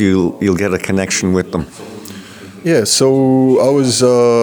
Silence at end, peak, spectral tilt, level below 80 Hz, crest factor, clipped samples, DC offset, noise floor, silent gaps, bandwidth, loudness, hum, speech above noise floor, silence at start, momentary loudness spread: 0 s; -2 dBFS; -4.5 dB/octave; -46 dBFS; 12 dB; under 0.1%; under 0.1%; -33 dBFS; none; over 20 kHz; -13 LUFS; none; 21 dB; 0 s; 20 LU